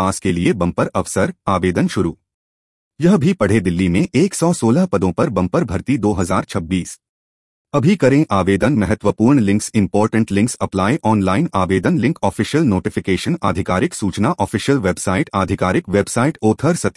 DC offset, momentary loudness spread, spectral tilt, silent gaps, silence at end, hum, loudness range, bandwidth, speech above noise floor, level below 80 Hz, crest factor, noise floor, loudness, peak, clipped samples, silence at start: under 0.1%; 5 LU; -6 dB/octave; 2.34-2.91 s, 7.09-7.65 s; 0.05 s; none; 2 LU; 12 kHz; over 74 dB; -46 dBFS; 14 dB; under -90 dBFS; -17 LUFS; -2 dBFS; under 0.1%; 0 s